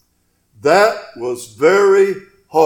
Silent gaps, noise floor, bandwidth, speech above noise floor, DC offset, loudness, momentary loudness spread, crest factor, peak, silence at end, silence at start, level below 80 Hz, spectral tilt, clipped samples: none; -63 dBFS; 17.5 kHz; 49 dB; under 0.1%; -15 LUFS; 14 LU; 16 dB; 0 dBFS; 0 s; 0.65 s; -60 dBFS; -4.5 dB/octave; under 0.1%